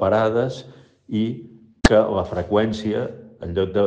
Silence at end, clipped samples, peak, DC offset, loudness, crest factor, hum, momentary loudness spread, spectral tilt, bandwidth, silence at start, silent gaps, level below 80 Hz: 0 s; under 0.1%; -2 dBFS; under 0.1%; -21 LUFS; 20 dB; none; 15 LU; -6 dB/octave; 9.6 kHz; 0 s; none; -34 dBFS